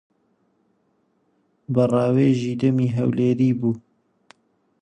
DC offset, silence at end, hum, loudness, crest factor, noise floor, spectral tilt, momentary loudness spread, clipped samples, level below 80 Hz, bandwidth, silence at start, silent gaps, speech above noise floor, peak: under 0.1%; 1.05 s; none; -21 LUFS; 16 dB; -67 dBFS; -9 dB/octave; 7 LU; under 0.1%; -60 dBFS; 9.4 kHz; 1.7 s; none; 47 dB; -6 dBFS